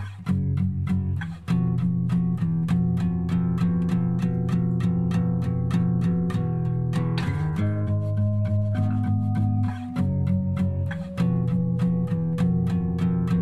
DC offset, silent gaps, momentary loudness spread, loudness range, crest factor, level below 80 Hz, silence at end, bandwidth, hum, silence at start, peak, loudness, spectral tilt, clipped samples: 0.5%; none; 3 LU; 1 LU; 12 dB; -46 dBFS; 0 s; 7.8 kHz; none; 0 s; -12 dBFS; -25 LUFS; -9.5 dB/octave; under 0.1%